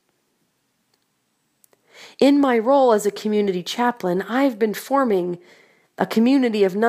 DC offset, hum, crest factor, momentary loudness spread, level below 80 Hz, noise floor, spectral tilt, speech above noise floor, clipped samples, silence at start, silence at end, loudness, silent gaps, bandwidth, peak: under 0.1%; none; 18 dB; 8 LU; -72 dBFS; -69 dBFS; -5.5 dB/octave; 51 dB; under 0.1%; 2 s; 0 s; -19 LUFS; none; 15.5 kHz; -2 dBFS